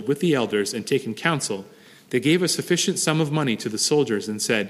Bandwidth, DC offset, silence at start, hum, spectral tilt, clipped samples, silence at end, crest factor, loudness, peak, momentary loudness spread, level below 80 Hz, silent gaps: 15.5 kHz; under 0.1%; 0 s; none; -4 dB/octave; under 0.1%; 0 s; 18 dB; -22 LUFS; -4 dBFS; 5 LU; -68 dBFS; none